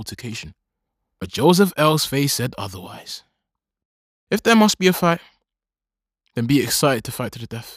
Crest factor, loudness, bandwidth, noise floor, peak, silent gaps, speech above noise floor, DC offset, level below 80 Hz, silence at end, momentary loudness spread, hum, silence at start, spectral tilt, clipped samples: 20 dB; -18 LUFS; 15.5 kHz; -89 dBFS; -2 dBFS; 3.85-4.27 s; 70 dB; under 0.1%; -56 dBFS; 0 s; 18 LU; none; 0 s; -4.5 dB/octave; under 0.1%